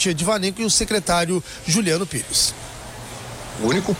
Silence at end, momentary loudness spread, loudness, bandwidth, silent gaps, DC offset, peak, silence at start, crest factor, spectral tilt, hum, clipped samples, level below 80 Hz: 0 s; 16 LU; -20 LUFS; 16.5 kHz; none; under 0.1%; -6 dBFS; 0 s; 16 dB; -3 dB/octave; none; under 0.1%; -42 dBFS